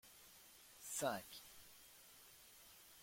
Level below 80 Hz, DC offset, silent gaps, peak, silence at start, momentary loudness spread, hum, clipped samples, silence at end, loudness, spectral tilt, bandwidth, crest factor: -80 dBFS; under 0.1%; none; -28 dBFS; 0.05 s; 18 LU; none; under 0.1%; 0 s; -47 LUFS; -2.5 dB/octave; 16.5 kHz; 24 dB